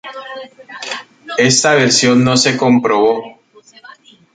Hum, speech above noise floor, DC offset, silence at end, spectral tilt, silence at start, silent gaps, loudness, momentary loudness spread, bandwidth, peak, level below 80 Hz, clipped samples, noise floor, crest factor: none; 32 dB; under 0.1%; 0.45 s; -3.5 dB/octave; 0.05 s; none; -12 LUFS; 19 LU; 9.4 kHz; 0 dBFS; -54 dBFS; under 0.1%; -46 dBFS; 14 dB